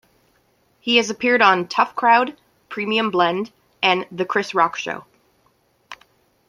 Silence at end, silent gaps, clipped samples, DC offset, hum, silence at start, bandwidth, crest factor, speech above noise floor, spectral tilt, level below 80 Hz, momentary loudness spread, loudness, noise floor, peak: 0.55 s; none; under 0.1%; under 0.1%; none; 0.85 s; 14 kHz; 20 dB; 43 dB; -3.5 dB/octave; -68 dBFS; 14 LU; -19 LUFS; -62 dBFS; -2 dBFS